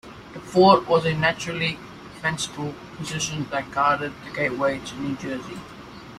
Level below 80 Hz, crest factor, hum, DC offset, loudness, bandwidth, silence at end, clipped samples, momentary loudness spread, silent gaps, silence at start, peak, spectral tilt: -54 dBFS; 22 dB; none; under 0.1%; -23 LUFS; 14 kHz; 0 s; under 0.1%; 20 LU; none; 0.05 s; -2 dBFS; -4.5 dB/octave